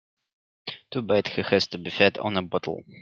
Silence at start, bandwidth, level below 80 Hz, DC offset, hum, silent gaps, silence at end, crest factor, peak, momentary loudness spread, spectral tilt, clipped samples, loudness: 0.65 s; 7.4 kHz; -66 dBFS; under 0.1%; none; none; 0 s; 24 dB; -2 dBFS; 16 LU; -5.5 dB/octave; under 0.1%; -25 LUFS